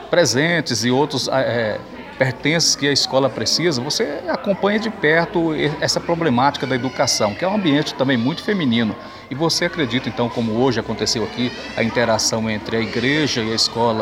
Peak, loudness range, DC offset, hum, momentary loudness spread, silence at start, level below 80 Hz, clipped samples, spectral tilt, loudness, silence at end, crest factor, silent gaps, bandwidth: -2 dBFS; 2 LU; under 0.1%; none; 6 LU; 0 s; -50 dBFS; under 0.1%; -4 dB/octave; -18 LUFS; 0 s; 18 dB; none; 16.5 kHz